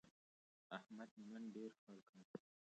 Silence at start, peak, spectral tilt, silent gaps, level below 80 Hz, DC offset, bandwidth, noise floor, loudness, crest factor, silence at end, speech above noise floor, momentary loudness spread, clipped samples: 0.05 s; -34 dBFS; -6 dB/octave; 0.11-0.70 s, 1.11-1.17 s, 1.79-1.87 s, 2.09-2.13 s, 2.25-2.34 s; under -90 dBFS; under 0.1%; 8.8 kHz; under -90 dBFS; -57 LUFS; 24 dB; 0.4 s; over 34 dB; 11 LU; under 0.1%